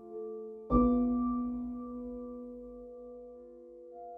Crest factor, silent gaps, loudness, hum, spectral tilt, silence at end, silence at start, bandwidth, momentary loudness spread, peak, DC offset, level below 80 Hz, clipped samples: 20 dB; none; -33 LUFS; none; -12 dB/octave; 0 s; 0 s; 2.5 kHz; 22 LU; -14 dBFS; under 0.1%; -48 dBFS; under 0.1%